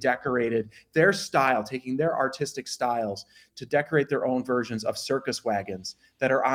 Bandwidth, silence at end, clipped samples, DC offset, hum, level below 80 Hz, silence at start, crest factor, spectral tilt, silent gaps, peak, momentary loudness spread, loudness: 16.5 kHz; 0 s; under 0.1%; under 0.1%; none; -68 dBFS; 0 s; 20 dB; -4.5 dB/octave; none; -8 dBFS; 10 LU; -27 LUFS